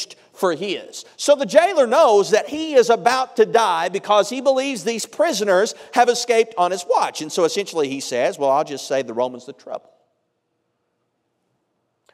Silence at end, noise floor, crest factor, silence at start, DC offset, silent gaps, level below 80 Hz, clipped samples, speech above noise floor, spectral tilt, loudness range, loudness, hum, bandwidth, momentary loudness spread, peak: 2.35 s; -72 dBFS; 18 dB; 0 s; under 0.1%; none; -74 dBFS; under 0.1%; 53 dB; -3 dB/octave; 8 LU; -19 LUFS; none; 15.5 kHz; 11 LU; 0 dBFS